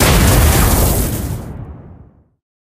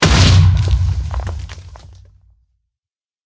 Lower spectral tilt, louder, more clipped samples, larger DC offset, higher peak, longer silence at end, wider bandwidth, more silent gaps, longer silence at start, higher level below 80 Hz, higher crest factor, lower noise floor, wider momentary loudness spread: about the same, -4.5 dB/octave vs -5 dB/octave; about the same, -13 LUFS vs -14 LUFS; neither; neither; about the same, 0 dBFS vs 0 dBFS; second, 0.7 s vs 1.4 s; first, 16 kHz vs 8 kHz; neither; about the same, 0 s vs 0 s; about the same, -18 dBFS vs -20 dBFS; about the same, 14 dB vs 16 dB; second, -43 dBFS vs -90 dBFS; about the same, 20 LU vs 21 LU